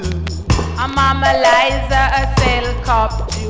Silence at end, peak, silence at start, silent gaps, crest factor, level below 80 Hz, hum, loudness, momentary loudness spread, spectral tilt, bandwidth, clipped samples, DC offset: 0 s; -4 dBFS; 0 s; none; 12 dB; -22 dBFS; none; -15 LUFS; 7 LU; -5 dB/octave; 8 kHz; under 0.1%; under 0.1%